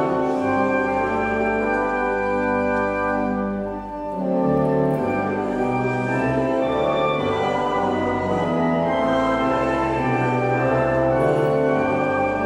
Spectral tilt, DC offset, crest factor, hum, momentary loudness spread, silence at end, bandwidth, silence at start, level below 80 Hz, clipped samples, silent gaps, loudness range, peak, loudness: -7.5 dB/octave; under 0.1%; 14 dB; none; 3 LU; 0 s; 10.5 kHz; 0 s; -44 dBFS; under 0.1%; none; 2 LU; -8 dBFS; -21 LUFS